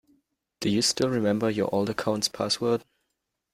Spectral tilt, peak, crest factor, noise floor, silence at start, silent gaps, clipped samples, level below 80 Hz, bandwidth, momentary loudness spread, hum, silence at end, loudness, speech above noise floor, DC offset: -4 dB/octave; -10 dBFS; 18 dB; -81 dBFS; 0.6 s; none; under 0.1%; -62 dBFS; 16 kHz; 4 LU; none; 0.75 s; -26 LUFS; 55 dB; under 0.1%